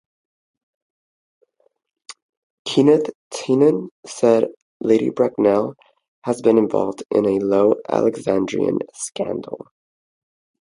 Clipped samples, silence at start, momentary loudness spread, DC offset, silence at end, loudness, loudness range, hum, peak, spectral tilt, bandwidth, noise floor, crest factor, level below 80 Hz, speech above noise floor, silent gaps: under 0.1%; 2.1 s; 13 LU; under 0.1%; 1.1 s; -19 LUFS; 4 LU; none; 0 dBFS; -6 dB/octave; 11.5 kHz; -64 dBFS; 20 dB; -62 dBFS; 45 dB; 2.22-2.65 s, 3.15-3.30 s, 3.91-4.03 s, 4.57-4.80 s, 6.08-6.22 s